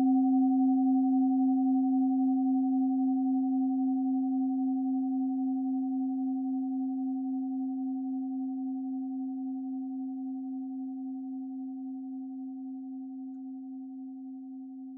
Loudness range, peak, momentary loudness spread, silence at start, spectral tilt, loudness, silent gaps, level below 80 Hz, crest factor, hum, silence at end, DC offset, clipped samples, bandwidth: 12 LU; -20 dBFS; 15 LU; 0 s; -12.5 dB/octave; -31 LUFS; none; under -90 dBFS; 12 dB; none; 0 s; under 0.1%; under 0.1%; 0.8 kHz